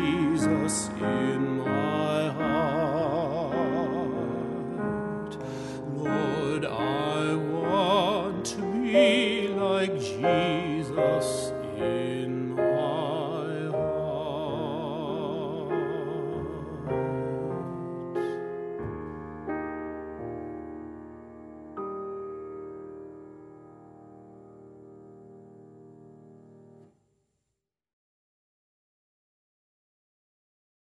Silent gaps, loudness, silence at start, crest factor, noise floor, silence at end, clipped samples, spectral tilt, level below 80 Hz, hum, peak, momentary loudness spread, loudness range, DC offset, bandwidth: none; -29 LUFS; 0 s; 20 dB; -84 dBFS; 4.15 s; under 0.1%; -5.5 dB/octave; -58 dBFS; none; -10 dBFS; 14 LU; 16 LU; under 0.1%; 11.5 kHz